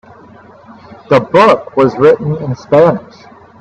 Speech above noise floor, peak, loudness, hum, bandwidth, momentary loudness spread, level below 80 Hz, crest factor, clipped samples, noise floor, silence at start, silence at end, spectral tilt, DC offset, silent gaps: 28 dB; 0 dBFS; -11 LUFS; none; 8.4 kHz; 9 LU; -48 dBFS; 12 dB; under 0.1%; -38 dBFS; 0.9 s; 0.6 s; -7.5 dB/octave; under 0.1%; none